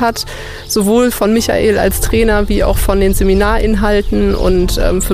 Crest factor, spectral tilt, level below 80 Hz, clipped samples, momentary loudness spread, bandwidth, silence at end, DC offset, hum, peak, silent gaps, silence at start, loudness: 10 dB; -5 dB/octave; -18 dBFS; under 0.1%; 4 LU; 15.5 kHz; 0 s; under 0.1%; none; 0 dBFS; none; 0 s; -13 LUFS